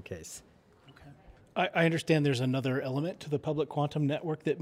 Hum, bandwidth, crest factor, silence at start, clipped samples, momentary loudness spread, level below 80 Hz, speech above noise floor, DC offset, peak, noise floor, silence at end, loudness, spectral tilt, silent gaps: none; 15 kHz; 20 dB; 0.05 s; under 0.1%; 14 LU; -66 dBFS; 28 dB; under 0.1%; -12 dBFS; -59 dBFS; 0 s; -30 LUFS; -6.5 dB/octave; none